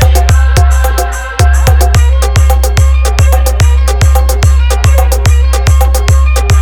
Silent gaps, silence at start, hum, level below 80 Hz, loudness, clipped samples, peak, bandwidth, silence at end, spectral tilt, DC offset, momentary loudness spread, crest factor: none; 0 s; none; -8 dBFS; -9 LUFS; 0.7%; 0 dBFS; 18 kHz; 0 s; -4.5 dB/octave; under 0.1%; 2 LU; 6 dB